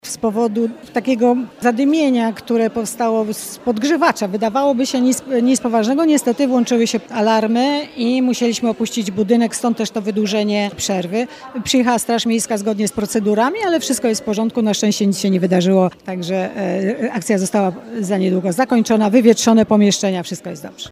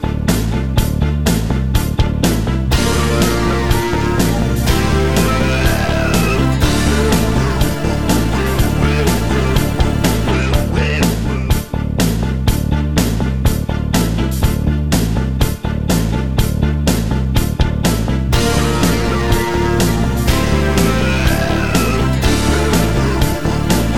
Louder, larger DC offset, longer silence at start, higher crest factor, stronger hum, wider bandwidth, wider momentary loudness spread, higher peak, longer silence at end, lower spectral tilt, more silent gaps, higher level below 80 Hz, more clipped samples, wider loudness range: about the same, -17 LUFS vs -15 LUFS; second, under 0.1% vs 3%; about the same, 0.05 s vs 0 s; about the same, 16 dB vs 14 dB; neither; second, 15.5 kHz vs 17.5 kHz; first, 7 LU vs 3 LU; about the same, 0 dBFS vs 0 dBFS; about the same, 0 s vs 0 s; about the same, -4.5 dB/octave vs -5.5 dB/octave; neither; second, -56 dBFS vs -20 dBFS; neither; about the same, 3 LU vs 2 LU